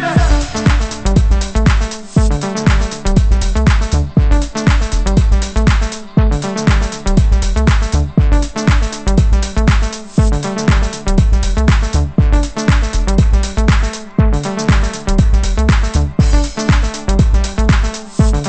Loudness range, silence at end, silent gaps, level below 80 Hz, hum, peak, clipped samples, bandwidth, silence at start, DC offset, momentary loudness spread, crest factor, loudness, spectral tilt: 0 LU; 0 s; none; -14 dBFS; none; 0 dBFS; under 0.1%; 8.6 kHz; 0 s; under 0.1%; 3 LU; 12 dB; -14 LUFS; -6 dB/octave